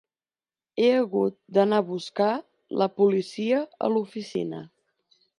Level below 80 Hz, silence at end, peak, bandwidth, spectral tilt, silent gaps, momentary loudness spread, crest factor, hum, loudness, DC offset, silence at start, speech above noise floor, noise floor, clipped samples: -78 dBFS; 0.75 s; -8 dBFS; 11 kHz; -6.5 dB/octave; none; 11 LU; 18 dB; none; -25 LUFS; under 0.1%; 0.75 s; over 66 dB; under -90 dBFS; under 0.1%